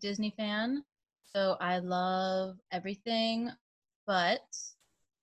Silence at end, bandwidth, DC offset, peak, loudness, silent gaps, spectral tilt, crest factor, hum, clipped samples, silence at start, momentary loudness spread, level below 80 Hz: 0.5 s; 9.6 kHz; under 0.1%; -16 dBFS; -33 LUFS; 3.61-3.82 s, 3.96-4.07 s; -4.5 dB/octave; 18 dB; none; under 0.1%; 0 s; 10 LU; -78 dBFS